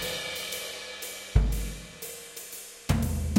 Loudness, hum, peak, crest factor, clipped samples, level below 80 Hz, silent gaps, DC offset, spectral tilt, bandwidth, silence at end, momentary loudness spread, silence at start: -32 LUFS; none; -8 dBFS; 22 dB; under 0.1%; -34 dBFS; none; under 0.1%; -4.5 dB/octave; 17 kHz; 0 s; 12 LU; 0 s